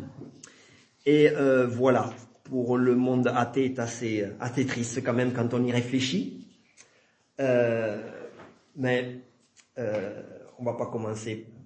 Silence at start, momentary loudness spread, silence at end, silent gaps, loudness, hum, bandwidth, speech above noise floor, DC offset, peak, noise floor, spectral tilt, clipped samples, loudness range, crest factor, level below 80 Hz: 0 s; 21 LU; 0.05 s; none; -27 LUFS; none; 8.8 kHz; 39 dB; under 0.1%; -8 dBFS; -65 dBFS; -6 dB/octave; under 0.1%; 8 LU; 20 dB; -70 dBFS